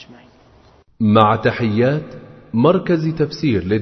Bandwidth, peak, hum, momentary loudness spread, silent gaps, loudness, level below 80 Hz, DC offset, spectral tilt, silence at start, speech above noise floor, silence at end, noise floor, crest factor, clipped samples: 6.4 kHz; 0 dBFS; none; 9 LU; none; -17 LUFS; -48 dBFS; under 0.1%; -8.5 dB/octave; 0 s; 34 dB; 0 s; -50 dBFS; 18 dB; under 0.1%